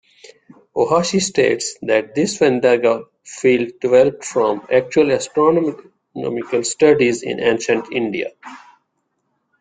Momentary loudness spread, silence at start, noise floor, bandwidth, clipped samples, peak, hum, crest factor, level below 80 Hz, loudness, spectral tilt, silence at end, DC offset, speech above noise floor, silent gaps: 10 LU; 0.75 s; -70 dBFS; 9.6 kHz; under 0.1%; -2 dBFS; none; 16 dB; -58 dBFS; -17 LUFS; -4.5 dB/octave; 1.05 s; under 0.1%; 54 dB; none